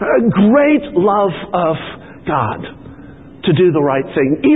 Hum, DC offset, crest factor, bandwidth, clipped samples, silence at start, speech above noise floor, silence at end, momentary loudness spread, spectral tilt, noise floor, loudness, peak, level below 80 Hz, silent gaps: none; 0.3%; 12 dB; 4 kHz; under 0.1%; 0 s; 23 dB; 0 s; 14 LU; -11.5 dB/octave; -36 dBFS; -14 LUFS; -2 dBFS; -46 dBFS; none